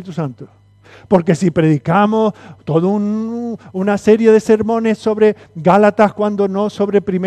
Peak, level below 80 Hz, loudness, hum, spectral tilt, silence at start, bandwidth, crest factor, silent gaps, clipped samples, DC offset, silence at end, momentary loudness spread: 0 dBFS; -52 dBFS; -14 LUFS; none; -7.5 dB/octave; 0 s; 9.8 kHz; 14 dB; none; under 0.1%; under 0.1%; 0 s; 11 LU